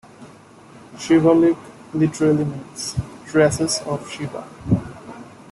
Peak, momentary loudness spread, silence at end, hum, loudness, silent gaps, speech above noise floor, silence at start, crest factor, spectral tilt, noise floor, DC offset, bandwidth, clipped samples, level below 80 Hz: -4 dBFS; 18 LU; 0.2 s; none; -20 LUFS; none; 26 dB; 0.2 s; 16 dB; -5.5 dB/octave; -45 dBFS; under 0.1%; 12.5 kHz; under 0.1%; -48 dBFS